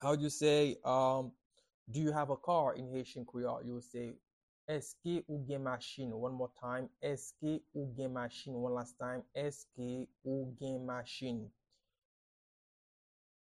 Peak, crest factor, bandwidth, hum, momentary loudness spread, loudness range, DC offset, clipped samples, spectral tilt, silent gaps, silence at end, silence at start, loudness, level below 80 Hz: -18 dBFS; 20 dB; 12.5 kHz; none; 12 LU; 8 LU; under 0.1%; under 0.1%; -5.5 dB/octave; 1.45-1.51 s, 1.74-1.86 s, 4.33-4.68 s; 2 s; 0 s; -39 LUFS; -72 dBFS